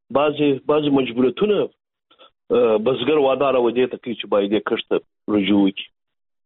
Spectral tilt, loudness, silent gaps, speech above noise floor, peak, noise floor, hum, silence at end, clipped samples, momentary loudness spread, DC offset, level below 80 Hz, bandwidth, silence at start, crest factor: -4.5 dB/octave; -19 LUFS; none; 35 dB; -4 dBFS; -54 dBFS; none; 0.6 s; under 0.1%; 7 LU; under 0.1%; -58 dBFS; 4.1 kHz; 0.1 s; 14 dB